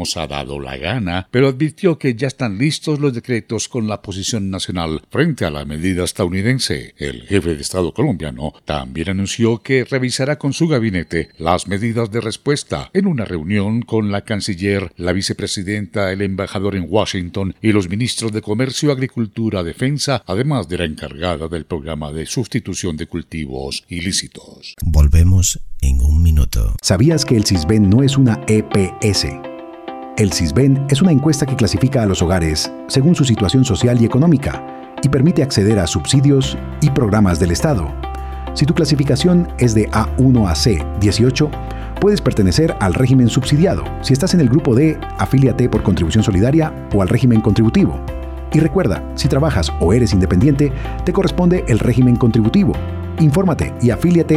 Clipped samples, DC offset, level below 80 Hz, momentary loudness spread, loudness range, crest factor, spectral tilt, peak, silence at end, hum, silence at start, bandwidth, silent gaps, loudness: under 0.1%; under 0.1%; -28 dBFS; 10 LU; 5 LU; 16 dB; -6 dB/octave; 0 dBFS; 0 s; none; 0 s; 15 kHz; none; -16 LUFS